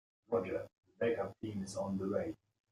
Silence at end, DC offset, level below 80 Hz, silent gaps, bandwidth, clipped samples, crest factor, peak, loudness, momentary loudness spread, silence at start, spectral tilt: 0.35 s; under 0.1%; -72 dBFS; 0.78-0.83 s; 12.5 kHz; under 0.1%; 18 dB; -22 dBFS; -39 LUFS; 8 LU; 0.3 s; -6.5 dB/octave